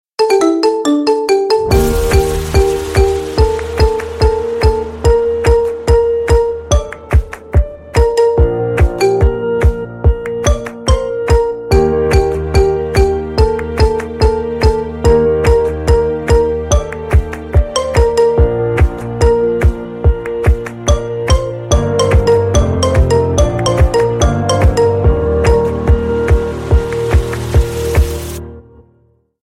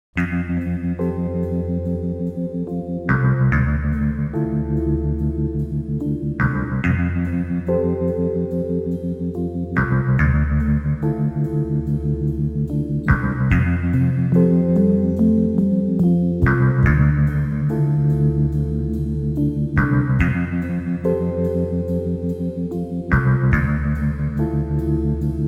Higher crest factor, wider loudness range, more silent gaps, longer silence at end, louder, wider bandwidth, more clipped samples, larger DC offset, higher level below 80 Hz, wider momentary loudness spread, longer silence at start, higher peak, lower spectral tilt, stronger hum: about the same, 12 dB vs 16 dB; about the same, 2 LU vs 4 LU; neither; first, 0.8 s vs 0 s; first, -13 LUFS vs -20 LUFS; first, 15.5 kHz vs 3.8 kHz; neither; neither; first, -18 dBFS vs -30 dBFS; second, 4 LU vs 7 LU; about the same, 0.2 s vs 0.15 s; first, 0 dBFS vs -4 dBFS; second, -6 dB/octave vs -10.5 dB/octave; neither